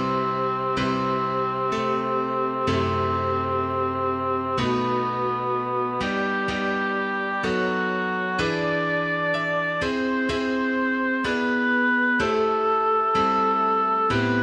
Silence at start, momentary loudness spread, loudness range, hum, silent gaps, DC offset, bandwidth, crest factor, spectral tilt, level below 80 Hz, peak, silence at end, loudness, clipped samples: 0 s; 4 LU; 3 LU; none; none; under 0.1%; 9.8 kHz; 14 dB; -6 dB/octave; -52 dBFS; -10 dBFS; 0 s; -23 LUFS; under 0.1%